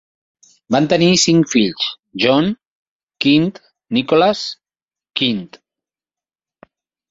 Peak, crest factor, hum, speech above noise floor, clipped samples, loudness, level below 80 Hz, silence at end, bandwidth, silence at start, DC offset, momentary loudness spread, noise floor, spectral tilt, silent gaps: -2 dBFS; 18 dB; none; over 75 dB; under 0.1%; -16 LUFS; -56 dBFS; 1.65 s; 8 kHz; 0.7 s; under 0.1%; 13 LU; under -90 dBFS; -4.5 dB/octave; 2.66-3.00 s